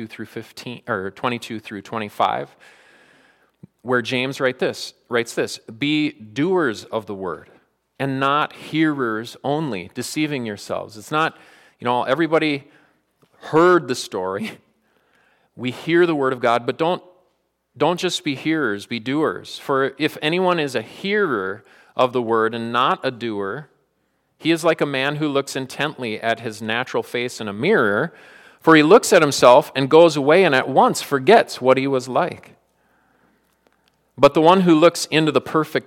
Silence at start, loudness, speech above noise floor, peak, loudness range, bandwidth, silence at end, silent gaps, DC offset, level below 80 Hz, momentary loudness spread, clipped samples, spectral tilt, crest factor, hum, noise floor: 0 s; -19 LUFS; 49 dB; 0 dBFS; 9 LU; 16.5 kHz; 0.05 s; none; under 0.1%; -66 dBFS; 15 LU; under 0.1%; -5 dB/octave; 20 dB; none; -68 dBFS